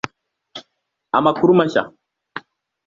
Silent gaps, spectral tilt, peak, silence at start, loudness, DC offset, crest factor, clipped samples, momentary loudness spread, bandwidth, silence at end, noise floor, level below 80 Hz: none; -7 dB/octave; -2 dBFS; 0.55 s; -17 LUFS; under 0.1%; 18 dB; under 0.1%; 23 LU; 7.4 kHz; 0.5 s; -73 dBFS; -60 dBFS